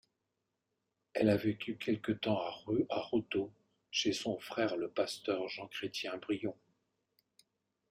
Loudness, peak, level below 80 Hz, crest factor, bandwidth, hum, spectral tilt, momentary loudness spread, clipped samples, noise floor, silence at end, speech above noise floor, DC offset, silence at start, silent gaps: -36 LUFS; -16 dBFS; -72 dBFS; 20 dB; 14.5 kHz; none; -5 dB/octave; 7 LU; under 0.1%; -86 dBFS; 1.35 s; 50 dB; under 0.1%; 1.15 s; none